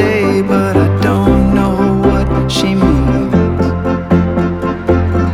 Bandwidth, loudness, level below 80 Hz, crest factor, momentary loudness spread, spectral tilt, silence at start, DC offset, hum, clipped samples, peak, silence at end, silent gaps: 13.5 kHz; -12 LUFS; -22 dBFS; 10 dB; 4 LU; -7.5 dB/octave; 0 s; under 0.1%; none; under 0.1%; 0 dBFS; 0 s; none